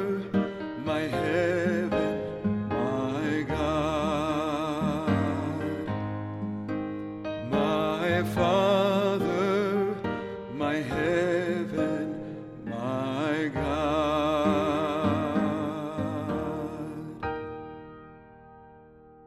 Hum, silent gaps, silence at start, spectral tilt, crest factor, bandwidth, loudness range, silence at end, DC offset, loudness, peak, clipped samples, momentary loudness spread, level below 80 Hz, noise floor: none; none; 0 s; -6.5 dB/octave; 16 dB; 14 kHz; 4 LU; 0 s; under 0.1%; -28 LUFS; -12 dBFS; under 0.1%; 10 LU; -50 dBFS; -52 dBFS